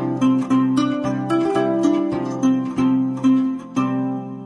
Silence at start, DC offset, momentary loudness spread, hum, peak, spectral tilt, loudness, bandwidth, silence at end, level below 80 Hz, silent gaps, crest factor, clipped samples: 0 s; under 0.1%; 5 LU; none; -6 dBFS; -7 dB/octave; -20 LUFS; 10.5 kHz; 0 s; -56 dBFS; none; 12 dB; under 0.1%